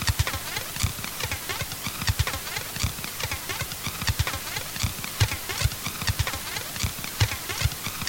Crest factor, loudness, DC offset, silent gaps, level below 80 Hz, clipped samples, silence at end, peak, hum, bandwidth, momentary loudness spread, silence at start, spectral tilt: 26 dB; -28 LUFS; under 0.1%; none; -38 dBFS; under 0.1%; 0 s; -2 dBFS; none; 17 kHz; 4 LU; 0 s; -2.5 dB/octave